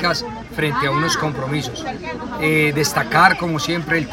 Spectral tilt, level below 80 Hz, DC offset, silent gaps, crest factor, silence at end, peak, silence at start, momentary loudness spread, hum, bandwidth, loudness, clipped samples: -4 dB/octave; -44 dBFS; under 0.1%; none; 20 dB; 0 s; 0 dBFS; 0 s; 14 LU; none; 16.5 kHz; -18 LUFS; under 0.1%